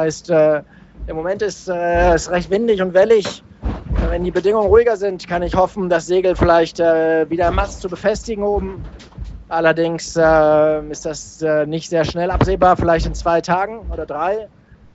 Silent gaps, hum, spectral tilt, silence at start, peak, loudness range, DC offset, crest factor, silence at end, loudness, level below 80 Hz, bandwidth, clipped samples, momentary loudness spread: none; none; -5.5 dB/octave; 0 s; 0 dBFS; 2 LU; under 0.1%; 16 dB; 0.5 s; -17 LUFS; -30 dBFS; 8.2 kHz; under 0.1%; 13 LU